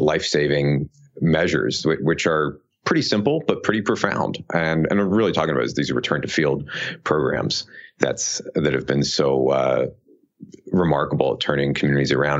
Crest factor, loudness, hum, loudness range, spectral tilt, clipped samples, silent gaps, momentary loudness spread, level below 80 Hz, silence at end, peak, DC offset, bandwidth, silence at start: 20 dB; -21 LUFS; none; 2 LU; -5 dB/octave; under 0.1%; none; 6 LU; -50 dBFS; 0 s; 0 dBFS; under 0.1%; 8 kHz; 0 s